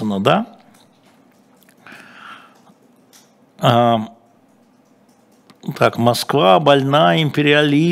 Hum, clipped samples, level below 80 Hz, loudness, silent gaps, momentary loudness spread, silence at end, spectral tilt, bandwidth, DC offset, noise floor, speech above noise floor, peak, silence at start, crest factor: none; under 0.1%; -64 dBFS; -15 LUFS; none; 20 LU; 0 s; -6 dB/octave; 16 kHz; under 0.1%; -53 dBFS; 39 dB; 0 dBFS; 0 s; 18 dB